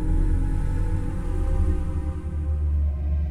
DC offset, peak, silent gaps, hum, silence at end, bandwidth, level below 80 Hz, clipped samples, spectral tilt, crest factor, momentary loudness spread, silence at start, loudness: under 0.1%; -12 dBFS; none; none; 0 s; 10 kHz; -24 dBFS; under 0.1%; -9 dB/octave; 12 dB; 5 LU; 0 s; -27 LUFS